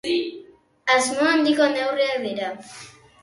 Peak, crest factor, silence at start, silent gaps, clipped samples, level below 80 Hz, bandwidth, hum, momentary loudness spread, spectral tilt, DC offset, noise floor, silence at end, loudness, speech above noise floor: -6 dBFS; 18 dB; 0.05 s; none; under 0.1%; -68 dBFS; 11.5 kHz; none; 17 LU; -2.5 dB/octave; under 0.1%; -48 dBFS; 0.35 s; -21 LUFS; 26 dB